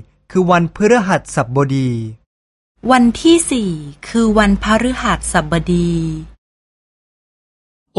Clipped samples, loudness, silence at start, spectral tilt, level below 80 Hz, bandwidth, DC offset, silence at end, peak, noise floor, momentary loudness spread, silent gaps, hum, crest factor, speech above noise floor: under 0.1%; -15 LUFS; 0.3 s; -5.5 dB/octave; -34 dBFS; 11.5 kHz; under 0.1%; 1.7 s; 0 dBFS; under -90 dBFS; 11 LU; 2.26-2.75 s; none; 16 dB; over 76 dB